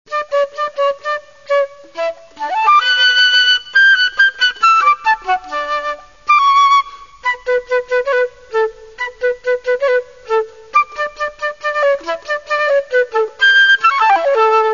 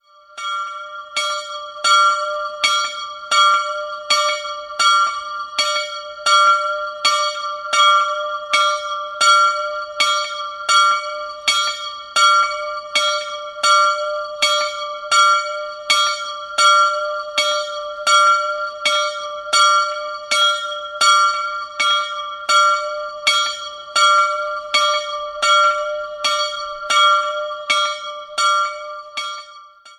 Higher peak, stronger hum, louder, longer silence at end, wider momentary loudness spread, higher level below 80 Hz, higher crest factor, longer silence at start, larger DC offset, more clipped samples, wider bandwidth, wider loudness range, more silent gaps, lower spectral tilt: about the same, 0 dBFS vs -2 dBFS; neither; first, -14 LUFS vs -17 LUFS; about the same, 0 s vs 0.05 s; about the same, 12 LU vs 13 LU; first, -54 dBFS vs -64 dBFS; about the same, 14 dB vs 18 dB; second, 0.1 s vs 0.35 s; first, 0.4% vs under 0.1%; neither; second, 7.4 kHz vs 13 kHz; first, 7 LU vs 1 LU; neither; first, 0.5 dB/octave vs 3 dB/octave